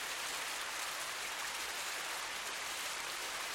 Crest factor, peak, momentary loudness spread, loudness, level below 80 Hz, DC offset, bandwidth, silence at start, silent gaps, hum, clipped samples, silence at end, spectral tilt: 16 dB; -26 dBFS; 1 LU; -39 LUFS; -72 dBFS; under 0.1%; 16 kHz; 0 s; none; none; under 0.1%; 0 s; 1 dB/octave